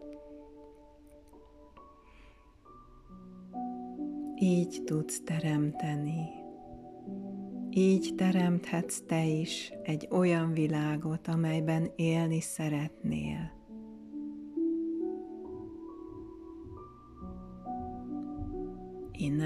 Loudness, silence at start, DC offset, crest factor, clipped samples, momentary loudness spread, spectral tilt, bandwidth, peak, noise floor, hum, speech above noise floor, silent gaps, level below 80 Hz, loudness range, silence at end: -33 LUFS; 0 s; under 0.1%; 16 dB; under 0.1%; 19 LU; -6.5 dB/octave; 13.5 kHz; -16 dBFS; -57 dBFS; none; 27 dB; none; -58 dBFS; 12 LU; 0 s